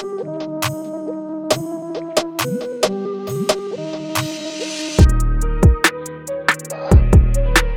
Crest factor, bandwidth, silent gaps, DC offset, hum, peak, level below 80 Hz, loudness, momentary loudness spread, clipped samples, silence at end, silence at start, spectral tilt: 16 dB; 18.5 kHz; none; under 0.1%; none; -2 dBFS; -20 dBFS; -19 LUFS; 13 LU; under 0.1%; 0 s; 0 s; -5 dB/octave